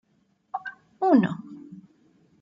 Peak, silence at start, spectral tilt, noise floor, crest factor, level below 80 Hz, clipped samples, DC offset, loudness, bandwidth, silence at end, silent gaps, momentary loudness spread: -8 dBFS; 0.55 s; -9 dB/octave; -68 dBFS; 20 dB; -72 dBFS; under 0.1%; under 0.1%; -24 LUFS; 7.4 kHz; 0.6 s; none; 23 LU